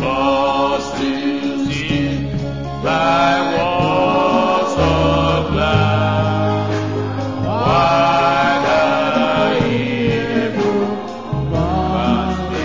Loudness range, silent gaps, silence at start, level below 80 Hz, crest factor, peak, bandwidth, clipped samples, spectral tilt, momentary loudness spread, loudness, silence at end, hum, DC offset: 3 LU; none; 0 s; -32 dBFS; 14 dB; -2 dBFS; 7.6 kHz; under 0.1%; -6.5 dB/octave; 7 LU; -16 LUFS; 0 s; none; 0.8%